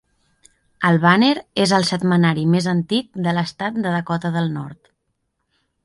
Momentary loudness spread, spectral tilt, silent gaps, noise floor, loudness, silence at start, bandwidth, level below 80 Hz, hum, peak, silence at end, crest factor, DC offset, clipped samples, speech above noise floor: 9 LU; -6 dB/octave; none; -72 dBFS; -18 LUFS; 0.8 s; 11.5 kHz; -60 dBFS; none; -2 dBFS; 1.1 s; 18 dB; under 0.1%; under 0.1%; 54 dB